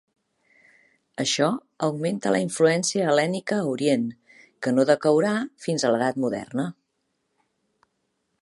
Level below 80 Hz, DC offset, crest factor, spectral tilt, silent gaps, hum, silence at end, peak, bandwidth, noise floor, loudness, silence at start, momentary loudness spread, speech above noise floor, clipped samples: -72 dBFS; under 0.1%; 20 dB; -4.5 dB/octave; none; none; 1.7 s; -6 dBFS; 11.5 kHz; -75 dBFS; -24 LUFS; 1.2 s; 9 LU; 52 dB; under 0.1%